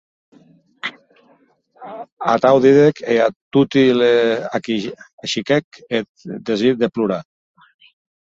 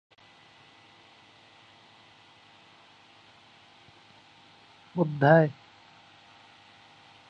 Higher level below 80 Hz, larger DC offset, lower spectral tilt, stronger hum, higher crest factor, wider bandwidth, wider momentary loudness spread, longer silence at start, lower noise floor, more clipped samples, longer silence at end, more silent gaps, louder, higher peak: first, -60 dBFS vs -74 dBFS; neither; second, -6 dB/octave vs -8.5 dB/octave; second, none vs 50 Hz at -60 dBFS; second, 18 dB vs 26 dB; first, 7.8 kHz vs 7 kHz; about the same, 17 LU vs 19 LU; second, 0.85 s vs 4.95 s; about the same, -56 dBFS vs -56 dBFS; neither; second, 1.1 s vs 1.75 s; first, 2.12-2.17 s, 3.36-3.51 s, 5.13-5.18 s, 5.64-5.71 s, 6.09-6.15 s vs none; first, -17 LUFS vs -24 LUFS; first, -2 dBFS vs -6 dBFS